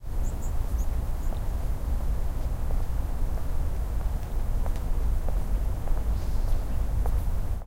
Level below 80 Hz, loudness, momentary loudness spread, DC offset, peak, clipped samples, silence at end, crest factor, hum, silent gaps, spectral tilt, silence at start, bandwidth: -26 dBFS; -32 LUFS; 3 LU; under 0.1%; -14 dBFS; under 0.1%; 0 s; 12 dB; none; none; -7 dB/octave; 0 s; 16 kHz